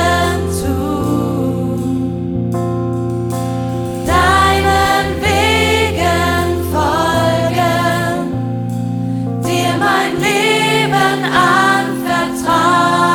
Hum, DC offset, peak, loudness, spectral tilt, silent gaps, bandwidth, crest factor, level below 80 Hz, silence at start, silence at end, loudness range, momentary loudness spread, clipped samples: none; under 0.1%; 0 dBFS; -14 LUFS; -5 dB/octave; none; 19.5 kHz; 14 dB; -32 dBFS; 0 s; 0 s; 5 LU; 8 LU; under 0.1%